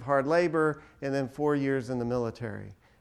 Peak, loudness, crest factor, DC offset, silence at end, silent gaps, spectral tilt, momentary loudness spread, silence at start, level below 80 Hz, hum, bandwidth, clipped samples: -12 dBFS; -29 LUFS; 16 dB; under 0.1%; 0.25 s; none; -7.5 dB/octave; 14 LU; 0 s; -60 dBFS; none; 12.5 kHz; under 0.1%